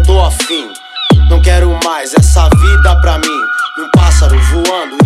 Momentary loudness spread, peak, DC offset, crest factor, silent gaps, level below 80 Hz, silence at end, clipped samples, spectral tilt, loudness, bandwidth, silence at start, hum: 7 LU; 0 dBFS; under 0.1%; 8 dB; none; -10 dBFS; 0 s; under 0.1%; -5 dB/octave; -10 LUFS; 13.5 kHz; 0 s; none